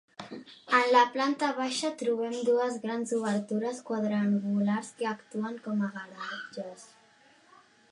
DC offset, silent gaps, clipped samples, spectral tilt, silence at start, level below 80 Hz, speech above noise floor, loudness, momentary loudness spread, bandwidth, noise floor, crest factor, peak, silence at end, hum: under 0.1%; none; under 0.1%; -5 dB/octave; 0.2 s; -82 dBFS; 31 dB; -29 LUFS; 16 LU; 11 kHz; -61 dBFS; 22 dB; -8 dBFS; 1.05 s; none